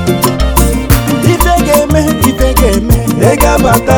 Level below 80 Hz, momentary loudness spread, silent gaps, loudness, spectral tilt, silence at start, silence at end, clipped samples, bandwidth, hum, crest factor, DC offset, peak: -14 dBFS; 3 LU; none; -9 LUFS; -5.5 dB/octave; 0 s; 0 s; 3%; over 20 kHz; none; 8 dB; under 0.1%; 0 dBFS